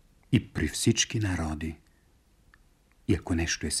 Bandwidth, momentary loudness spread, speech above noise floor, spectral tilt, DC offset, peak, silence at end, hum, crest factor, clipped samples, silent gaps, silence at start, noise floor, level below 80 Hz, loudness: 15 kHz; 13 LU; 35 dB; -4 dB/octave; under 0.1%; -10 dBFS; 0 s; none; 20 dB; under 0.1%; none; 0.3 s; -63 dBFS; -44 dBFS; -29 LUFS